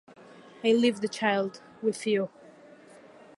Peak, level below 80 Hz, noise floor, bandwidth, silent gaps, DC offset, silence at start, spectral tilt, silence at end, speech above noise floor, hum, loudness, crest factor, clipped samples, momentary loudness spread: -10 dBFS; -80 dBFS; -52 dBFS; 11.5 kHz; none; under 0.1%; 0.65 s; -4.5 dB/octave; 1.1 s; 26 dB; none; -28 LUFS; 20 dB; under 0.1%; 9 LU